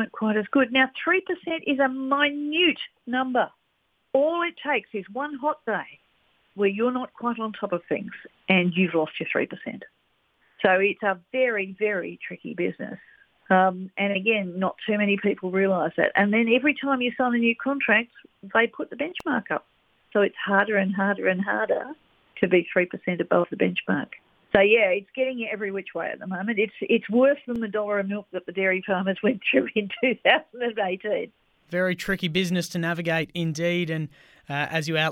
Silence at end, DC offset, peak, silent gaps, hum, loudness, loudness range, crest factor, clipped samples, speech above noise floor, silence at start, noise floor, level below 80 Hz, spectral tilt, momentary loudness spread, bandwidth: 0 s; under 0.1%; -2 dBFS; none; none; -24 LUFS; 4 LU; 22 dB; under 0.1%; 47 dB; 0 s; -71 dBFS; -64 dBFS; -6 dB/octave; 10 LU; 15 kHz